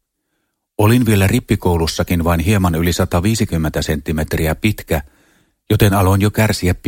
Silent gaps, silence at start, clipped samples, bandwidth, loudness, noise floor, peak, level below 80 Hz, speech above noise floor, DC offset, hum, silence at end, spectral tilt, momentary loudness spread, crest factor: none; 0.8 s; under 0.1%; 17 kHz; -16 LUFS; -70 dBFS; 0 dBFS; -30 dBFS; 56 dB; under 0.1%; none; 0 s; -6 dB/octave; 7 LU; 16 dB